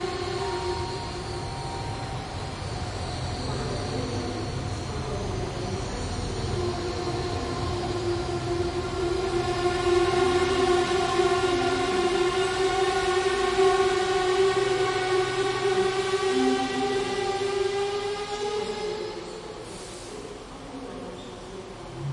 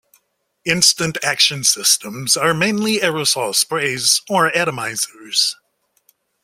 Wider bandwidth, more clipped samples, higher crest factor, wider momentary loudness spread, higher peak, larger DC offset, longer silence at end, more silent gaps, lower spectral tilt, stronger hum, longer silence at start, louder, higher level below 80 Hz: second, 11.5 kHz vs 16.5 kHz; neither; about the same, 16 dB vs 18 dB; first, 15 LU vs 7 LU; second, -10 dBFS vs 0 dBFS; neither; second, 0 s vs 0.9 s; neither; first, -5 dB/octave vs -1.5 dB/octave; neither; second, 0 s vs 0.65 s; second, -26 LUFS vs -16 LUFS; first, -44 dBFS vs -58 dBFS